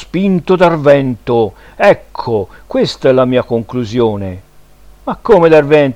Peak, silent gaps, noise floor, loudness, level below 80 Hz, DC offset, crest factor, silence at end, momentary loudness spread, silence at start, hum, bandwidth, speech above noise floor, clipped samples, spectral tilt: 0 dBFS; none; -39 dBFS; -12 LUFS; -40 dBFS; under 0.1%; 12 dB; 0 s; 13 LU; 0 s; none; 11 kHz; 28 dB; 0.2%; -7 dB/octave